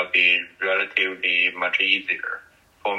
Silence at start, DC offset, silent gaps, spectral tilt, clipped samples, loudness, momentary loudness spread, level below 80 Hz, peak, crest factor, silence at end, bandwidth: 0 s; under 0.1%; none; -2.5 dB/octave; under 0.1%; -20 LUFS; 12 LU; -70 dBFS; -4 dBFS; 20 dB; 0 s; 11.5 kHz